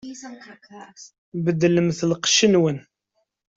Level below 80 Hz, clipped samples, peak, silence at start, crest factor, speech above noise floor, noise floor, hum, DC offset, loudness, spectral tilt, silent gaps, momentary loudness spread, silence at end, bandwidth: -62 dBFS; under 0.1%; -6 dBFS; 0.05 s; 18 dB; 52 dB; -74 dBFS; none; under 0.1%; -19 LUFS; -4 dB/octave; 1.18-1.32 s; 22 LU; 0.75 s; 8 kHz